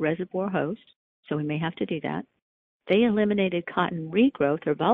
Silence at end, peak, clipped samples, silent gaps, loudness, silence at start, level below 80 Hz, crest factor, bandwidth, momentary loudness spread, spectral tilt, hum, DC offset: 0 s; -8 dBFS; under 0.1%; 0.96-1.23 s, 2.42-2.80 s; -26 LUFS; 0 s; -62 dBFS; 18 dB; 4.4 kHz; 10 LU; -9.5 dB/octave; none; under 0.1%